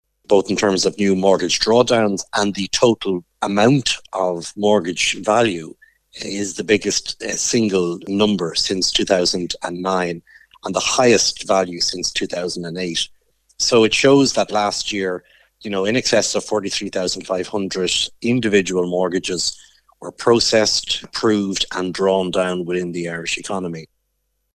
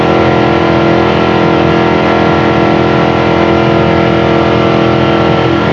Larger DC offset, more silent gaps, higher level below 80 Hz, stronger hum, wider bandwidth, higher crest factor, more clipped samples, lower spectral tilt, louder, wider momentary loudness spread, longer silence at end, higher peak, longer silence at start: neither; neither; second, -52 dBFS vs -36 dBFS; neither; first, 14.5 kHz vs 7.4 kHz; first, 18 dB vs 8 dB; neither; second, -3.5 dB/octave vs -7.5 dB/octave; second, -18 LUFS vs -9 LUFS; first, 10 LU vs 1 LU; first, 0.7 s vs 0 s; about the same, 0 dBFS vs 0 dBFS; first, 0.3 s vs 0 s